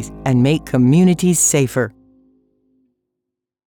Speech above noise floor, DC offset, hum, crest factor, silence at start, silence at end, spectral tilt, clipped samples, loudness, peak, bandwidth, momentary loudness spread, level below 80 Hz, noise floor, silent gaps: 65 dB; under 0.1%; none; 14 dB; 0 s; 1.85 s; -5.5 dB/octave; under 0.1%; -15 LUFS; -2 dBFS; 20 kHz; 8 LU; -46 dBFS; -80 dBFS; none